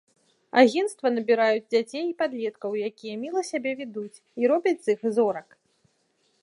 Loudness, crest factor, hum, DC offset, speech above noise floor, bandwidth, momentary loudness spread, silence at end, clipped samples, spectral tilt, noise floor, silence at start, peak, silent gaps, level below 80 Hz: -25 LUFS; 22 dB; none; under 0.1%; 45 dB; 11.5 kHz; 13 LU; 1 s; under 0.1%; -4.5 dB/octave; -69 dBFS; 0.55 s; -4 dBFS; none; -82 dBFS